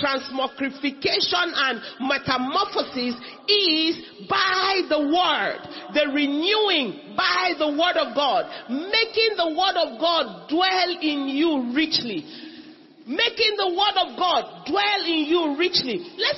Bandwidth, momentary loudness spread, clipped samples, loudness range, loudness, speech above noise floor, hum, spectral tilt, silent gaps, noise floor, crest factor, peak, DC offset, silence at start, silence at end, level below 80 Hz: 6 kHz; 8 LU; under 0.1%; 2 LU; -22 LUFS; 23 dB; none; -3.5 dB/octave; none; -45 dBFS; 18 dB; -6 dBFS; under 0.1%; 0 s; 0 s; -62 dBFS